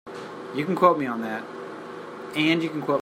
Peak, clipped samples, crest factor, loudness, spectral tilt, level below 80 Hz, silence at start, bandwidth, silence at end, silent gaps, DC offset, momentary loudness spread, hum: -4 dBFS; under 0.1%; 22 dB; -24 LUFS; -6 dB/octave; -72 dBFS; 0.05 s; 16 kHz; 0 s; none; under 0.1%; 17 LU; none